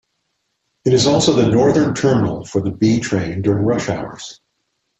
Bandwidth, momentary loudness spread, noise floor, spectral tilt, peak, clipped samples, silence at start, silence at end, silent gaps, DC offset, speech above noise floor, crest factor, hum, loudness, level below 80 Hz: 8.4 kHz; 11 LU; -71 dBFS; -5.5 dB/octave; -2 dBFS; under 0.1%; 0.85 s; 0.65 s; none; under 0.1%; 55 dB; 14 dB; none; -16 LUFS; -46 dBFS